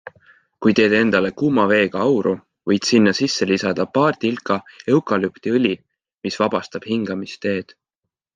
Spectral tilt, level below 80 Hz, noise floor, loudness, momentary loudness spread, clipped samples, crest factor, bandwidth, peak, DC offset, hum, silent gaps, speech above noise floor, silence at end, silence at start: -5 dB/octave; -62 dBFS; -82 dBFS; -19 LUFS; 10 LU; under 0.1%; 16 dB; 9.6 kHz; -2 dBFS; under 0.1%; none; none; 64 dB; 0.75 s; 0.05 s